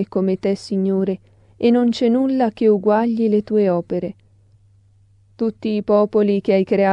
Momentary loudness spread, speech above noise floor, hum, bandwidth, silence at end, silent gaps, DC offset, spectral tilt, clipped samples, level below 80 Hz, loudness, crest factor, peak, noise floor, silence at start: 8 LU; 36 dB; none; 9.4 kHz; 0 s; none; under 0.1%; -8 dB/octave; under 0.1%; -58 dBFS; -18 LUFS; 16 dB; -4 dBFS; -53 dBFS; 0 s